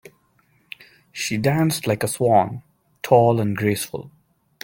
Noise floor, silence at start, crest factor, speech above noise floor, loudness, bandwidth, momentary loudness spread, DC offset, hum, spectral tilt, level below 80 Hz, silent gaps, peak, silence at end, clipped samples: -62 dBFS; 1.15 s; 20 dB; 42 dB; -20 LUFS; 17 kHz; 23 LU; under 0.1%; none; -5.5 dB/octave; -58 dBFS; none; -2 dBFS; 0.55 s; under 0.1%